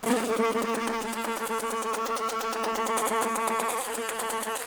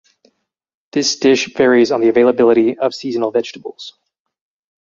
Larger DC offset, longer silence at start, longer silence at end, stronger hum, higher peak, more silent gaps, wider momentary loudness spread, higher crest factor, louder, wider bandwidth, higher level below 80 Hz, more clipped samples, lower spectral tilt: neither; second, 0 s vs 0.95 s; second, 0 s vs 1.05 s; neither; second, -10 dBFS vs -2 dBFS; neither; second, 4 LU vs 18 LU; about the same, 18 dB vs 14 dB; second, -28 LUFS vs -14 LUFS; first, over 20 kHz vs 7.6 kHz; second, -64 dBFS vs -58 dBFS; neither; second, -2.5 dB/octave vs -4 dB/octave